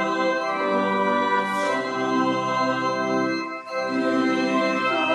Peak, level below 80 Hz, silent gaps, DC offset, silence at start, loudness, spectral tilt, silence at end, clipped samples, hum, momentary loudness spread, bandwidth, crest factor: -8 dBFS; -76 dBFS; none; under 0.1%; 0 s; -23 LUFS; -5 dB/octave; 0 s; under 0.1%; none; 3 LU; 12.5 kHz; 14 dB